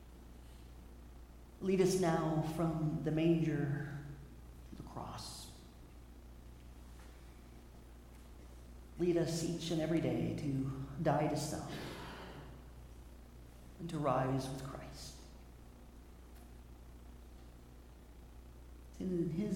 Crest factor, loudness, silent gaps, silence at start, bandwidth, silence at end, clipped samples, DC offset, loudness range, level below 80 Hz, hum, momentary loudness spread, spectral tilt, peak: 20 dB; -37 LUFS; none; 0 s; 16.5 kHz; 0 s; under 0.1%; under 0.1%; 20 LU; -56 dBFS; 60 Hz at -55 dBFS; 23 LU; -6.5 dB/octave; -20 dBFS